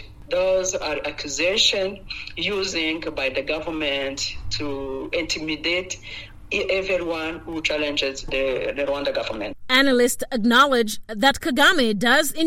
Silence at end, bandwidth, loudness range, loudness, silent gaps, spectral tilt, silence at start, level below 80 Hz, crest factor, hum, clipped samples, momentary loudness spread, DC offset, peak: 0 s; 16 kHz; 6 LU; -22 LUFS; none; -2.5 dB/octave; 0 s; -44 dBFS; 16 dB; none; under 0.1%; 12 LU; under 0.1%; -6 dBFS